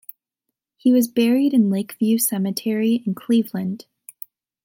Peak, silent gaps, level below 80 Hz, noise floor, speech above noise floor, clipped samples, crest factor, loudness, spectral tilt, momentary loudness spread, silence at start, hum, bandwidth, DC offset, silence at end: -8 dBFS; none; -74 dBFS; -81 dBFS; 62 dB; under 0.1%; 14 dB; -20 LUFS; -5.5 dB/octave; 20 LU; 0.85 s; none; 17 kHz; under 0.1%; 0.9 s